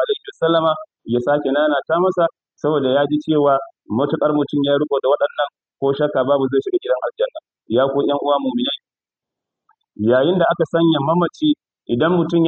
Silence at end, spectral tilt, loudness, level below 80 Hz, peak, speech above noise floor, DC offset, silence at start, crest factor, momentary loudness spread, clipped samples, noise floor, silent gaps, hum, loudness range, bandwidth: 0 s; -8 dB/octave; -18 LUFS; -62 dBFS; -4 dBFS; 73 dB; under 0.1%; 0 s; 14 dB; 7 LU; under 0.1%; -90 dBFS; none; none; 2 LU; 7 kHz